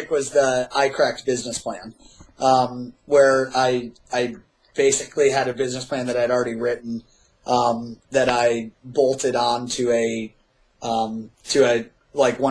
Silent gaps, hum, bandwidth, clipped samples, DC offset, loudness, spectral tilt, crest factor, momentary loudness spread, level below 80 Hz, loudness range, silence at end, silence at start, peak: none; none; 11 kHz; under 0.1%; under 0.1%; -21 LUFS; -3.5 dB/octave; 18 dB; 12 LU; -56 dBFS; 2 LU; 0 s; 0 s; -4 dBFS